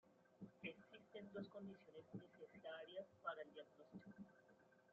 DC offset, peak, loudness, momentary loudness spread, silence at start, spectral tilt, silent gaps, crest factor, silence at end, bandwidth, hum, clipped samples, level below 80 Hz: under 0.1%; -36 dBFS; -58 LUFS; 11 LU; 0.05 s; -4 dB/octave; none; 22 dB; 0 s; 7 kHz; none; under 0.1%; under -90 dBFS